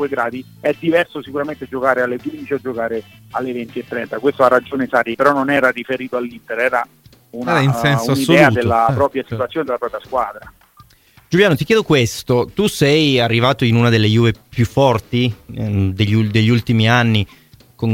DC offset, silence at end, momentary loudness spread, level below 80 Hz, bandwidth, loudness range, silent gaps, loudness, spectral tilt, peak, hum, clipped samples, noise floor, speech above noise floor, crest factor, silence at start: under 0.1%; 0 s; 11 LU; -46 dBFS; 16.5 kHz; 5 LU; none; -16 LUFS; -6 dB/octave; 0 dBFS; none; under 0.1%; -50 dBFS; 34 dB; 16 dB; 0 s